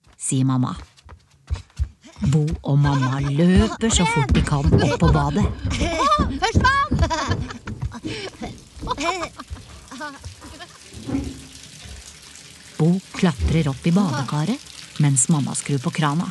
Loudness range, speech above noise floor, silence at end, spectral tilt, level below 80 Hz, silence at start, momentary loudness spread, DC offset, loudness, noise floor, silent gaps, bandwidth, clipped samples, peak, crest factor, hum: 12 LU; 28 dB; 0 s; -5 dB/octave; -32 dBFS; 0.2 s; 21 LU; under 0.1%; -21 LUFS; -47 dBFS; none; 12 kHz; under 0.1%; -2 dBFS; 20 dB; none